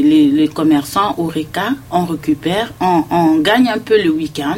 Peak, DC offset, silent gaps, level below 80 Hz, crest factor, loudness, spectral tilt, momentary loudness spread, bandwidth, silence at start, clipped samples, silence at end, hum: 0 dBFS; under 0.1%; none; -46 dBFS; 14 dB; -15 LUFS; -5.5 dB/octave; 7 LU; 16.5 kHz; 0 s; under 0.1%; 0 s; none